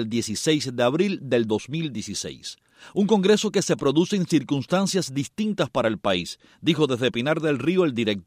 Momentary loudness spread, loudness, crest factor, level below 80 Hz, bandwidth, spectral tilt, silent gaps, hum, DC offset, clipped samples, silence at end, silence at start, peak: 9 LU; -23 LUFS; 18 dB; -60 dBFS; 15.5 kHz; -5 dB/octave; none; none; under 0.1%; under 0.1%; 0.05 s; 0 s; -6 dBFS